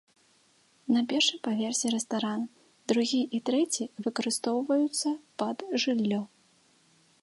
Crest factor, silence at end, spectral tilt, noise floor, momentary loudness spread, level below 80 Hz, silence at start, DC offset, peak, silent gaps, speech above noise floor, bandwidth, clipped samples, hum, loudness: 18 dB; 0.95 s; -3 dB/octave; -65 dBFS; 8 LU; -80 dBFS; 0.85 s; under 0.1%; -12 dBFS; none; 36 dB; 11.5 kHz; under 0.1%; none; -29 LUFS